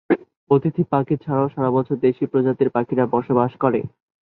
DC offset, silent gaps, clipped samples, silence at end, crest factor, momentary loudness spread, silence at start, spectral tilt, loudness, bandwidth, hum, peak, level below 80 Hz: under 0.1%; 0.37-0.47 s; under 0.1%; 0.35 s; 18 dB; 4 LU; 0.1 s; -12 dB/octave; -20 LUFS; 4.2 kHz; none; -2 dBFS; -58 dBFS